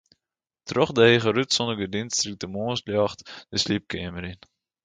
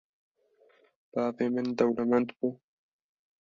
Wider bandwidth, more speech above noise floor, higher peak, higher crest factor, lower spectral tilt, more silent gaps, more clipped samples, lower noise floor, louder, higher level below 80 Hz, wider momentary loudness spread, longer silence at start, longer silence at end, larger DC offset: first, 9.4 kHz vs 7.2 kHz; first, 64 dB vs 37 dB; first, -4 dBFS vs -10 dBFS; about the same, 22 dB vs 22 dB; second, -4 dB/octave vs -7.5 dB/octave; neither; neither; first, -88 dBFS vs -66 dBFS; first, -24 LUFS vs -30 LUFS; first, -54 dBFS vs -72 dBFS; first, 16 LU vs 8 LU; second, 0.65 s vs 1.15 s; second, 0.5 s vs 0.85 s; neither